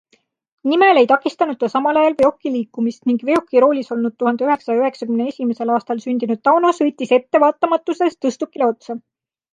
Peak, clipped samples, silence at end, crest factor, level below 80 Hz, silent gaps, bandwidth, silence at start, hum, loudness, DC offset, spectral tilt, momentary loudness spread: -2 dBFS; under 0.1%; 0.55 s; 16 dB; -64 dBFS; none; 9.8 kHz; 0.65 s; none; -17 LUFS; under 0.1%; -5.5 dB/octave; 9 LU